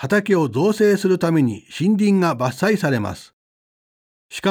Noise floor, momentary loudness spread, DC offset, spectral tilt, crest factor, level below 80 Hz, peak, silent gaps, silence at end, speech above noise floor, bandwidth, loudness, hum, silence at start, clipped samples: under -90 dBFS; 7 LU; under 0.1%; -6.5 dB/octave; 14 dB; -60 dBFS; -4 dBFS; 3.33-4.29 s; 0 s; over 72 dB; 16.5 kHz; -18 LUFS; none; 0 s; under 0.1%